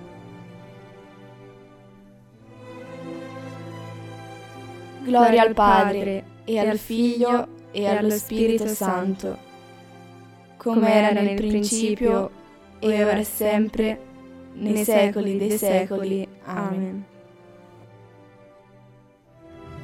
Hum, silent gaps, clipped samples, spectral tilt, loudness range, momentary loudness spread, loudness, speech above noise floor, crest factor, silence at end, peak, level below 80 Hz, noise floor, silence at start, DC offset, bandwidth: none; none; under 0.1%; -5 dB/octave; 19 LU; 22 LU; -22 LUFS; 32 dB; 20 dB; 0 s; -4 dBFS; -50 dBFS; -53 dBFS; 0 s; under 0.1%; 17 kHz